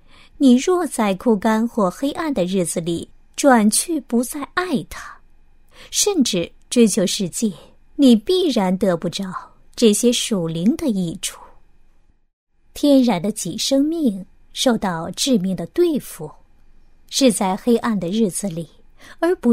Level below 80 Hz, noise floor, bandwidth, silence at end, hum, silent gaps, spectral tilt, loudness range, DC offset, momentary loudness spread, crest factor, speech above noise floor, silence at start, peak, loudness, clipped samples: -48 dBFS; -52 dBFS; 16 kHz; 0 s; none; 12.33-12.47 s; -4 dB/octave; 3 LU; under 0.1%; 13 LU; 18 dB; 34 dB; 0.4 s; -2 dBFS; -19 LUFS; under 0.1%